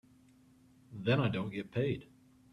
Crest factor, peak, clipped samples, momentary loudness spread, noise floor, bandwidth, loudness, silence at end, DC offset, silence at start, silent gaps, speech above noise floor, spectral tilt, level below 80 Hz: 20 dB; -18 dBFS; under 0.1%; 10 LU; -63 dBFS; 11 kHz; -35 LUFS; 0.5 s; under 0.1%; 0.9 s; none; 30 dB; -8 dB/octave; -66 dBFS